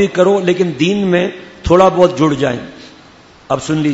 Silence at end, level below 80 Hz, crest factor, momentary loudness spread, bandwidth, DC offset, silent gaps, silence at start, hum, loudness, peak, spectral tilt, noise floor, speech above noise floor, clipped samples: 0 s; -38 dBFS; 14 dB; 11 LU; 8 kHz; under 0.1%; none; 0 s; none; -13 LUFS; 0 dBFS; -6 dB/octave; -42 dBFS; 29 dB; 0.1%